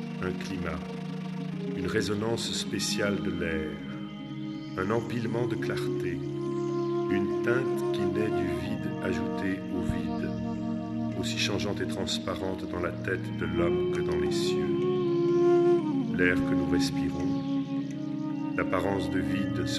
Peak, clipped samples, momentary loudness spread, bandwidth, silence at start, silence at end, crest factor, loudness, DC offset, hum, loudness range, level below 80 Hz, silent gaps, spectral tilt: -10 dBFS; under 0.1%; 8 LU; 13 kHz; 0 s; 0 s; 18 dB; -29 LUFS; under 0.1%; none; 5 LU; -52 dBFS; none; -5.5 dB/octave